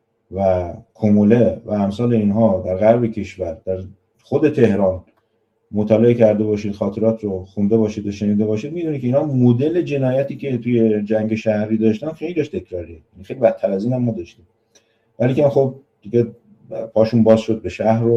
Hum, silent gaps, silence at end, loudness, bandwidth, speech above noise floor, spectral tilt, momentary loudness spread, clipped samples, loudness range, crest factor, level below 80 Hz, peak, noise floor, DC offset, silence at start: none; none; 0 s; -18 LUFS; 7.8 kHz; 48 dB; -9 dB/octave; 12 LU; under 0.1%; 4 LU; 18 dB; -52 dBFS; 0 dBFS; -66 dBFS; under 0.1%; 0.3 s